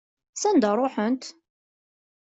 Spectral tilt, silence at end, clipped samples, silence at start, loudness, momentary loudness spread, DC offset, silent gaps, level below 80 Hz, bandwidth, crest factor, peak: -4.5 dB/octave; 1 s; under 0.1%; 0.35 s; -24 LUFS; 17 LU; under 0.1%; none; -70 dBFS; 8.2 kHz; 16 dB; -10 dBFS